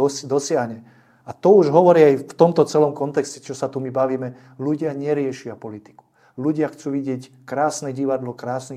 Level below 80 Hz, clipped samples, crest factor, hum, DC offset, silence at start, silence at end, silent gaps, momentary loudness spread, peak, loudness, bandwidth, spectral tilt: -68 dBFS; under 0.1%; 20 dB; none; under 0.1%; 0 s; 0 s; none; 18 LU; 0 dBFS; -20 LUFS; 13 kHz; -6 dB/octave